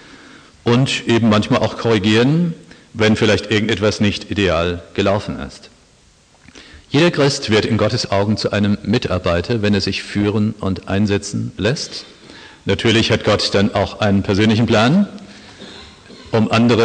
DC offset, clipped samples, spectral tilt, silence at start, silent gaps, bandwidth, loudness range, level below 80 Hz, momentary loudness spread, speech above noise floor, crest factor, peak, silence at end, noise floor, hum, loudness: under 0.1%; under 0.1%; -5.5 dB/octave; 0.65 s; none; 9.8 kHz; 4 LU; -44 dBFS; 12 LU; 35 dB; 16 dB; 0 dBFS; 0 s; -51 dBFS; none; -16 LUFS